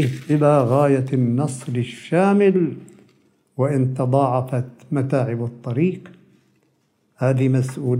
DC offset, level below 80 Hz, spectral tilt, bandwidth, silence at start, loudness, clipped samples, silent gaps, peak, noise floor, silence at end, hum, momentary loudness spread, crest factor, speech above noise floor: under 0.1%; -68 dBFS; -8 dB/octave; 11.5 kHz; 0 s; -20 LUFS; under 0.1%; none; -4 dBFS; -65 dBFS; 0 s; none; 10 LU; 16 dB; 46 dB